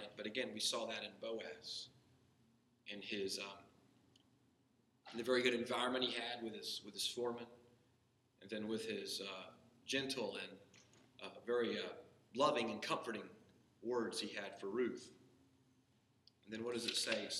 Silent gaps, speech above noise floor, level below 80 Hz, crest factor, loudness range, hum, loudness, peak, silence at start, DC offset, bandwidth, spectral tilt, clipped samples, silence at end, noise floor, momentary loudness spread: none; 34 dB; -86 dBFS; 24 dB; 7 LU; none; -42 LUFS; -22 dBFS; 0 s; under 0.1%; 13 kHz; -2.5 dB/octave; under 0.1%; 0 s; -77 dBFS; 15 LU